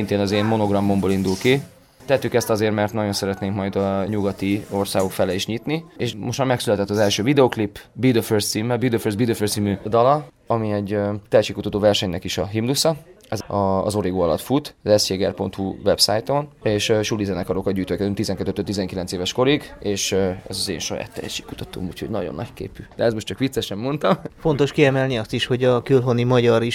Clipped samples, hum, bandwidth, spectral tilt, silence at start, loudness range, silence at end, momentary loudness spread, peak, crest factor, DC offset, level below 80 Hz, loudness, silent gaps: under 0.1%; none; 17 kHz; -5 dB/octave; 0 s; 4 LU; 0 s; 9 LU; -2 dBFS; 18 dB; under 0.1%; -48 dBFS; -21 LUFS; none